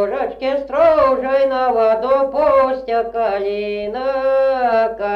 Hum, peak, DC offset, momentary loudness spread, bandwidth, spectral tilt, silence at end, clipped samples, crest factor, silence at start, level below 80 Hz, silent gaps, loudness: 50 Hz at -50 dBFS; -4 dBFS; under 0.1%; 7 LU; 5.8 kHz; -6 dB/octave; 0 s; under 0.1%; 12 dB; 0 s; -46 dBFS; none; -16 LUFS